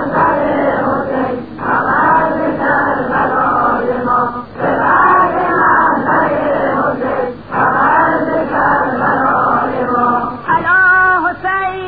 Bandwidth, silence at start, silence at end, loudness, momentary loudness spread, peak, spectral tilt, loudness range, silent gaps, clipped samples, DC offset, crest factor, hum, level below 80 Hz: 5 kHz; 0 s; 0 s; -13 LUFS; 7 LU; 0 dBFS; -10 dB/octave; 2 LU; none; under 0.1%; 0.7%; 12 dB; none; -44 dBFS